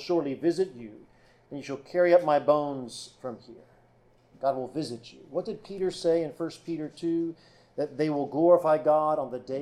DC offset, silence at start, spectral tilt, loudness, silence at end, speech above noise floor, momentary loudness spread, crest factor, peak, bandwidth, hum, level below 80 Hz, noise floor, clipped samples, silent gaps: under 0.1%; 0 s; -6.5 dB/octave; -27 LUFS; 0 s; 34 dB; 18 LU; 20 dB; -8 dBFS; 11 kHz; none; -68 dBFS; -61 dBFS; under 0.1%; none